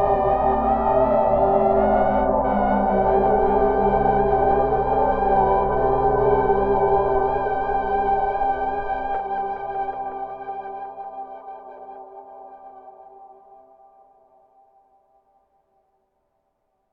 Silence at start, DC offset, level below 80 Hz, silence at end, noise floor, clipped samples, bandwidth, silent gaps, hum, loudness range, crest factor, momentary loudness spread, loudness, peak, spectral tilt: 0 s; under 0.1%; -38 dBFS; 3.65 s; -71 dBFS; under 0.1%; 4.9 kHz; none; none; 17 LU; 16 dB; 17 LU; -20 LUFS; -6 dBFS; -10.5 dB/octave